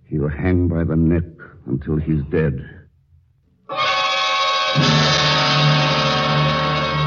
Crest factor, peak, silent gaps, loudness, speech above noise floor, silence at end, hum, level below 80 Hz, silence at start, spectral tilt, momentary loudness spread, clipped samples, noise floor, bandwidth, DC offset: 16 dB; -2 dBFS; none; -17 LUFS; 39 dB; 0 s; none; -36 dBFS; 0.1 s; -5 dB/octave; 10 LU; under 0.1%; -57 dBFS; 7.2 kHz; under 0.1%